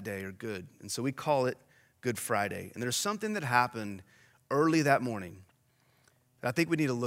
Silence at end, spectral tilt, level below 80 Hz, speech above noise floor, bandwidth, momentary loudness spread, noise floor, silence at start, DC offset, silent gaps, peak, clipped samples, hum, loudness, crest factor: 0 s; -4.5 dB/octave; -76 dBFS; 38 dB; 16 kHz; 13 LU; -69 dBFS; 0 s; under 0.1%; none; -10 dBFS; under 0.1%; none; -31 LUFS; 22 dB